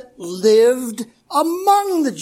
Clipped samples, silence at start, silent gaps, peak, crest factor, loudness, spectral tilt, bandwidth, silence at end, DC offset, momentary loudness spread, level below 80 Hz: under 0.1%; 0.2 s; none; -2 dBFS; 14 dB; -16 LUFS; -4 dB/octave; 16.5 kHz; 0 s; under 0.1%; 15 LU; -68 dBFS